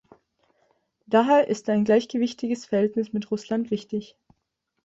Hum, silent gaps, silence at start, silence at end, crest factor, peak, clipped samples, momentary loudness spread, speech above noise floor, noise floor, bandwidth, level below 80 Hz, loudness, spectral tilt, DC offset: none; none; 1.1 s; 0.8 s; 18 dB; -8 dBFS; under 0.1%; 10 LU; 55 dB; -78 dBFS; 8 kHz; -68 dBFS; -24 LUFS; -6 dB/octave; under 0.1%